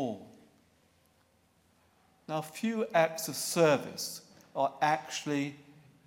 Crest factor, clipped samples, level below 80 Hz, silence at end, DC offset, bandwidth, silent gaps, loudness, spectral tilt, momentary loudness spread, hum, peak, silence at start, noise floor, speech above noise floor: 22 dB; under 0.1%; -82 dBFS; 0.35 s; under 0.1%; 17 kHz; none; -31 LUFS; -4 dB/octave; 12 LU; none; -12 dBFS; 0 s; -69 dBFS; 38 dB